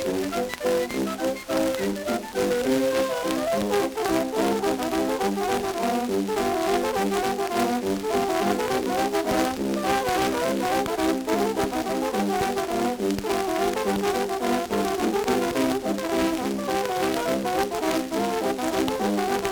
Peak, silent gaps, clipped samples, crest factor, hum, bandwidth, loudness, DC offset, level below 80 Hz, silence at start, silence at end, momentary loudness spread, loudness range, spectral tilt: -6 dBFS; none; under 0.1%; 18 dB; none; over 20 kHz; -25 LUFS; under 0.1%; -50 dBFS; 0 s; 0 s; 3 LU; 1 LU; -4.5 dB/octave